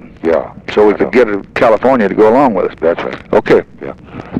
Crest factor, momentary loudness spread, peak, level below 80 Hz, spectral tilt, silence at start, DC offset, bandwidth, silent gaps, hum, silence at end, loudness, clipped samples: 10 dB; 11 LU; 0 dBFS; -42 dBFS; -7 dB/octave; 0.05 s; under 0.1%; 8.4 kHz; none; none; 0 s; -12 LUFS; under 0.1%